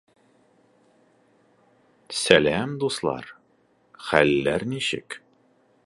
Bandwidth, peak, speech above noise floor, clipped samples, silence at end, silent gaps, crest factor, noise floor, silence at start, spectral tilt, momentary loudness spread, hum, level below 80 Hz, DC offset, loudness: 11.5 kHz; 0 dBFS; 41 dB; under 0.1%; 0.7 s; none; 26 dB; -63 dBFS; 2.1 s; -4 dB/octave; 20 LU; none; -56 dBFS; under 0.1%; -23 LUFS